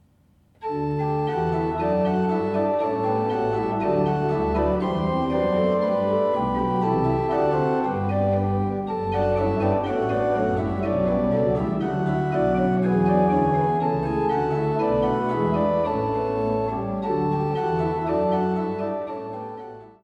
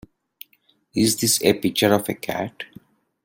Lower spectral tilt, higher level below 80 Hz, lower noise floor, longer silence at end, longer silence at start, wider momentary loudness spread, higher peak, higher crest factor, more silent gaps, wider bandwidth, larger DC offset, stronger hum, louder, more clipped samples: first, -9.5 dB/octave vs -3.5 dB/octave; first, -44 dBFS vs -58 dBFS; second, -59 dBFS vs -63 dBFS; second, 0.15 s vs 0.6 s; second, 0.6 s vs 0.95 s; second, 5 LU vs 14 LU; second, -8 dBFS vs -2 dBFS; about the same, 16 dB vs 20 dB; neither; second, 7.8 kHz vs 17 kHz; neither; neither; about the same, -23 LUFS vs -21 LUFS; neither